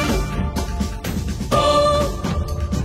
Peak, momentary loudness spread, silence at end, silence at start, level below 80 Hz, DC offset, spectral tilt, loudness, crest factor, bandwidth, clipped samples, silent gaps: -6 dBFS; 10 LU; 0 s; 0 s; -26 dBFS; under 0.1%; -5.5 dB/octave; -21 LUFS; 14 dB; 16 kHz; under 0.1%; none